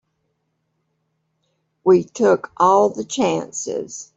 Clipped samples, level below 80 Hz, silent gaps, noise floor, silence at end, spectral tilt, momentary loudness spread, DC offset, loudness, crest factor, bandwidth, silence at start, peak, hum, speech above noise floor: under 0.1%; -64 dBFS; none; -72 dBFS; 0.15 s; -5 dB/octave; 11 LU; under 0.1%; -18 LUFS; 18 dB; 8 kHz; 1.85 s; -2 dBFS; none; 54 dB